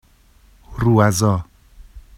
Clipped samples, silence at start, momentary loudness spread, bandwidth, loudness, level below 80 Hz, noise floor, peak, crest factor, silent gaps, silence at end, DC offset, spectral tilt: under 0.1%; 0.7 s; 12 LU; 15.5 kHz; -17 LUFS; -40 dBFS; -52 dBFS; 0 dBFS; 20 dB; none; 0.2 s; under 0.1%; -6 dB/octave